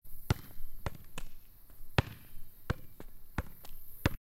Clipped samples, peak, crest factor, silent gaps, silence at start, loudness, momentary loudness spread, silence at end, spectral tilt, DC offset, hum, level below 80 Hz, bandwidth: under 0.1%; -10 dBFS; 26 dB; none; 0.05 s; -40 LUFS; 21 LU; 0.05 s; -5.5 dB/octave; under 0.1%; none; -44 dBFS; 16.5 kHz